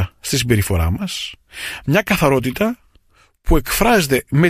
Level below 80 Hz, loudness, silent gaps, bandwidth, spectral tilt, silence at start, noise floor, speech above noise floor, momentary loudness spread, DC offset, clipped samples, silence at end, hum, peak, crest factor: -28 dBFS; -18 LUFS; none; 15.5 kHz; -5 dB/octave; 0 s; -54 dBFS; 38 dB; 14 LU; under 0.1%; under 0.1%; 0 s; none; -2 dBFS; 16 dB